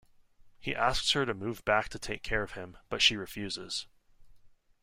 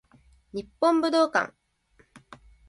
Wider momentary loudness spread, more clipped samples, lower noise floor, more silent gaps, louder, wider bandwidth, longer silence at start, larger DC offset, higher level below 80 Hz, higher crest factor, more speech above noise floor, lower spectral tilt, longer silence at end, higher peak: second, 13 LU vs 16 LU; neither; second, -58 dBFS vs -64 dBFS; neither; second, -31 LUFS vs -24 LUFS; first, 16 kHz vs 11.5 kHz; about the same, 0.45 s vs 0.55 s; neither; first, -50 dBFS vs -62 dBFS; first, 24 dB vs 18 dB; second, 27 dB vs 40 dB; second, -2.5 dB/octave vs -4 dB/octave; second, 0.35 s vs 0.5 s; about the same, -10 dBFS vs -10 dBFS